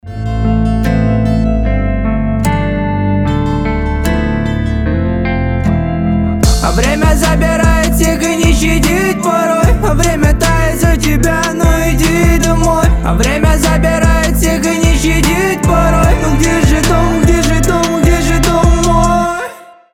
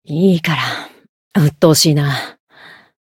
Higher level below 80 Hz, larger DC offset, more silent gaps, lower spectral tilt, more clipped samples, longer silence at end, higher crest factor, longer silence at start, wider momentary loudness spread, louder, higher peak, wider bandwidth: first, -16 dBFS vs -56 dBFS; neither; second, none vs 1.09-1.31 s; about the same, -5.5 dB/octave vs -5 dB/octave; neither; second, 0.3 s vs 0.75 s; second, 10 dB vs 16 dB; about the same, 0.05 s vs 0.1 s; second, 4 LU vs 12 LU; about the same, -12 LUFS vs -14 LUFS; about the same, 0 dBFS vs 0 dBFS; about the same, 17 kHz vs 17 kHz